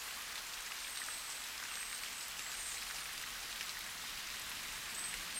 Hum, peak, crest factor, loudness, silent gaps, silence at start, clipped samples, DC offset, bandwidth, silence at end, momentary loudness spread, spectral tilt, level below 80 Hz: none; -24 dBFS; 20 dB; -42 LUFS; none; 0 s; under 0.1%; under 0.1%; over 20 kHz; 0 s; 2 LU; 1 dB/octave; -66 dBFS